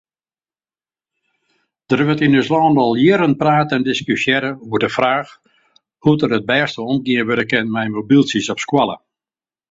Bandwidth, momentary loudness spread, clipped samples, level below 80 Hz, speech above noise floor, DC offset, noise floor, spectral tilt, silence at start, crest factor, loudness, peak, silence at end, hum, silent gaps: 7.8 kHz; 7 LU; under 0.1%; -56 dBFS; over 74 dB; under 0.1%; under -90 dBFS; -6 dB/octave; 1.9 s; 16 dB; -16 LUFS; -2 dBFS; 0.75 s; none; none